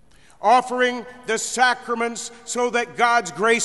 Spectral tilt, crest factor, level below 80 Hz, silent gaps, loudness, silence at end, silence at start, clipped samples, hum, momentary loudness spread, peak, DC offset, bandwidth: -2 dB/octave; 18 dB; -62 dBFS; none; -21 LUFS; 0 s; 0.4 s; under 0.1%; none; 9 LU; -4 dBFS; 0.2%; 11.5 kHz